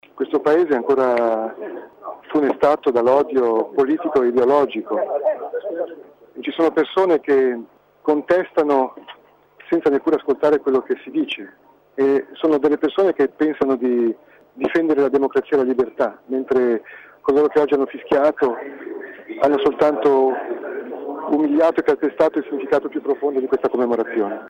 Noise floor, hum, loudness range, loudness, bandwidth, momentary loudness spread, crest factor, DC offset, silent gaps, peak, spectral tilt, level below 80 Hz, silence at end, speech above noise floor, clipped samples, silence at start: -50 dBFS; 50 Hz at -70 dBFS; 2 LU; -19 LUFS; 7.4 kHz; 12 LU; 16 dB; under 0.1%; none; -4 dBFS; -6.5 dB/octave; -60 dBFS; 0 s; 31 dB; under 0.1%; 0.15 s